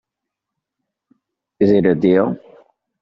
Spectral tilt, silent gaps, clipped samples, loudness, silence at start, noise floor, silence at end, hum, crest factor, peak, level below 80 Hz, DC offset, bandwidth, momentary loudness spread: -7.5 dB/octave; none; under 0.1%; -16 LUFS; 1.6 s; -82 dBFS; 0.65 s; none; 18 dB; -2 dBFS; -56 dBFS; under 0.1%; 6 kHz; 8 LU